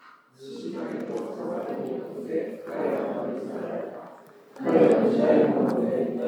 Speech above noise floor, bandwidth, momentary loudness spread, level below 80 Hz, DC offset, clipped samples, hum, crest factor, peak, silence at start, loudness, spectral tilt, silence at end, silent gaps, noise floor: 23 dB; 11.5 kHz; 15 LU; -88 dBFS; under 0.1%; under 0.1%; none; 20 dB; -6 dBFS; 0.05 s; -26 LUFS; -8 dB/octave; 0 s; none; -48 dBFS